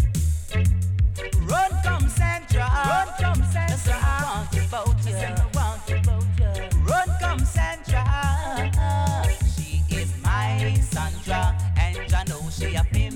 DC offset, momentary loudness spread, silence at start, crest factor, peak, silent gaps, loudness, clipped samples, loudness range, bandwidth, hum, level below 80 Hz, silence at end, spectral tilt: under 0.1%; 4 LU; 0 s; 12 dB; -10 dBFS; none; -23 LUFS; under 0.1%; 1 LU; 16.5 kHz; none; -26 dBFS; 0 s; -5.5 dB/octave